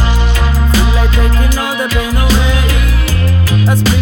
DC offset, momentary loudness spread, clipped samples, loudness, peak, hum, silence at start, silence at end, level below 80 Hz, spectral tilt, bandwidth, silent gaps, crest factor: under 0.1%; 3 LU; under 0.1%; -11 LUFS; 0 dBFS; none; 0 s; 0 s; -10 dBFS; -5 dB/octave; 19 kHz; none; 8 dB